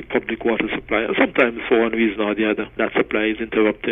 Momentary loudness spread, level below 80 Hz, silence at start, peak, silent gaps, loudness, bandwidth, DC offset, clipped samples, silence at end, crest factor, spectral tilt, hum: 5 LU; -48 dBFS; 0 s; -2 dBFS; none; -20 LUFS; 3.9 kHz; under 0.1%; under 0.1%; 0 s; 18 dB; -7.5 dB/octave; none